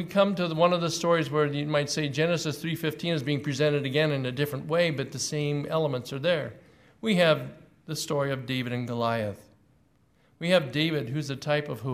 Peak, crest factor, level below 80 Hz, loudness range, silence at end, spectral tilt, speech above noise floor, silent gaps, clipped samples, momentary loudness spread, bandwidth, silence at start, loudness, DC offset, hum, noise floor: -8 dBFS; 20 dB; -66 dBFS; 3 LU; 0 s; -5 dB/octave; 38 dB; none; under 0.1%; 8 LU; 15.5 kHz; 0 s; -27 LUFS; under 0.1%; none; -64 dBFS